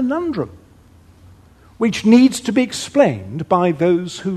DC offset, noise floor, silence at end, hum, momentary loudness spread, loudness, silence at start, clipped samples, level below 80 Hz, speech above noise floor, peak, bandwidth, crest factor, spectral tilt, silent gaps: under 0.1%; -47 dBFS; 0 s; none; 12 LU; -17 LUFS; 0 s; under 0.1%; -52 dBFS; 31 dB; 0 dBFS; 13 kHz; 18 dB; -5.5 dB/octave; none